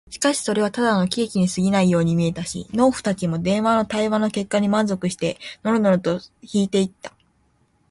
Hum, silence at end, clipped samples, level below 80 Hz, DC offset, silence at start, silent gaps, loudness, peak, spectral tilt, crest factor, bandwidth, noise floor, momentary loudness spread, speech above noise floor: none; 0.8 s; under 0.1%; -54 dBFS; under 0.1%; 0.1 s; none; -21 LUFS; -6 dBFS; -5.5 dB/octave; 16 dB; 11.5 kHz; -63 dBFS; 8 LU; 42 dB